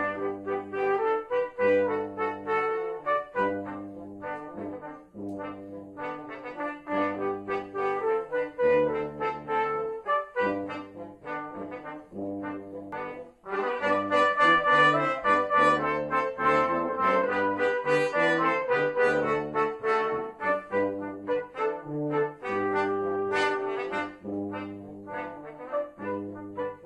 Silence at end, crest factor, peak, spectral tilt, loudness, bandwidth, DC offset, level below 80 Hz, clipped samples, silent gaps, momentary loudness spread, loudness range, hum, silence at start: 0 s; 18 dB; -10 dBFS; -5.5 dB/octave; -28 LUFS; 10 kHz; under 0.1%; -64 dBFS; under 0.1%; none; 15 LU; 11 LU; none; 0 s